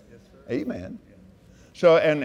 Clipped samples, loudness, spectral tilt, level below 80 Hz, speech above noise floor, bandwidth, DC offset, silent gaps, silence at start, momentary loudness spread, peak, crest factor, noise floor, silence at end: under 0.1%; -22 LUFS; -6.5 dB/octave; -60 dBFS; 31 dB; 9.6 kHz; under 0.1%; none; 0.5 s; 22 LU; -6 dBFS; 18 dB; -52 dBFS; 0 s